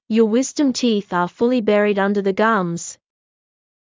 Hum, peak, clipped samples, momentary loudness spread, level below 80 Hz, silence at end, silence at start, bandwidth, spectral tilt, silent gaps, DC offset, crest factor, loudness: none; -4 dBFS; under 0.1%; 7 LU; -64 dBFS; 0.95 s; 0.1 s; 7.6 kHz; -5 dB/octave; none; under 0.1%; 14 dB; -18 LUFS